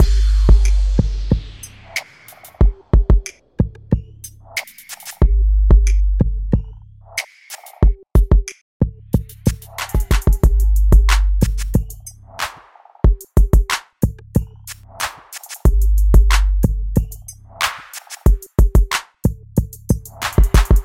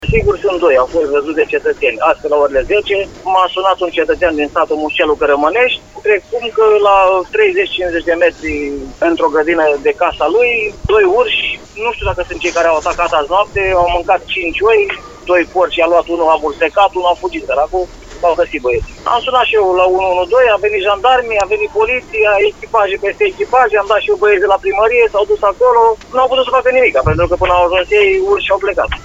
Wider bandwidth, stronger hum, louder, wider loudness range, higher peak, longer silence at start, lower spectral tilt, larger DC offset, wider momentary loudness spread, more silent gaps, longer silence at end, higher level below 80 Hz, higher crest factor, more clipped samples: first, 16 kHz vs 8 kHz; neither; second, -18 LUFS vs -12 LUFS; about the same, 3 LU vs 2 LU; about the same, 0 dBFS vs 0 dBFS; about the same, 0 s vs 0 s; about the same, -5.5 dB/octave vs -5 dB/octave; second, under 0.1% vs 0.1%; first, 18 LU vs 6 LU; first, 8.61-8.80 s vs none; about the same, 0 s vs 0 s; first, -16 dBFS vs -34 dBFS; about the same, 16 dB vs 12 dB; neither